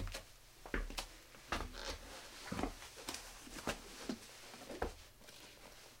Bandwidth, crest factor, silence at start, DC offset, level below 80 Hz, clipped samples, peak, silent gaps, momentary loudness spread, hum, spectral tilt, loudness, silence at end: 16.5 kHz; 26 dB; 0 s; under 0.1%; -54 dBFS; under 0.1%; -22 dBFS; none; 13 LU; none; -3.5 dB/octave; -47 LUFS; 0 s